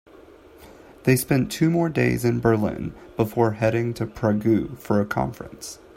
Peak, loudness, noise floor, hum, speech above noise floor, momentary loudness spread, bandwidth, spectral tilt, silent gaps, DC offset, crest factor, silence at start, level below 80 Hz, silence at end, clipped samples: -4 dBFS; -23 LUFS; -48 dBFS; none; 26 dB; 10 LU; 16 kHz; -6.5 dB/octave; none; under 0.1%; 18 dB; 0.6 s; -48 dBFS; 0.2 s; under 0.1%